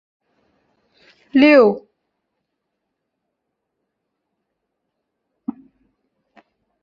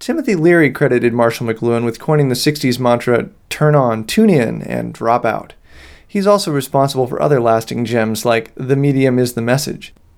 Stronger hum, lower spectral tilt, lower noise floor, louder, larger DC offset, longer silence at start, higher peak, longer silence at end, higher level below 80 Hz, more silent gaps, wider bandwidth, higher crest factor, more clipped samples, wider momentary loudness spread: neither; about the same, -7 dB/octave vs -6 dB/octave; first, -77 dBFS vs -40 dBFS; about the same, -13 LUFS vs -15 LUFS; neither; first, 1.35 s vs 0 s; about the same, -2 dBFS vs 0 dBFS; first, 5.05 s vs 0.3 s; second, -68 dBFS vs -48 dBFS; neither; second, 6.4 kHz vs 18 kHz; first, 20 dB vs 14 dB; neither; first, 22 LU vs 7 LU